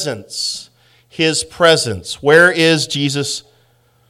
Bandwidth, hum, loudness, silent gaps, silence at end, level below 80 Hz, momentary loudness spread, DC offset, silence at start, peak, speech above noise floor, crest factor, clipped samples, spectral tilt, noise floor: 15 kHz; none; -14 LUFS; none; 0.7 s; -54 dBFS; 13 LU; under 0.1%; 0 s; 0 dBFS; 41 dB; 16 dB; 0.2%; -3.5 dB/octave; -55 dBFS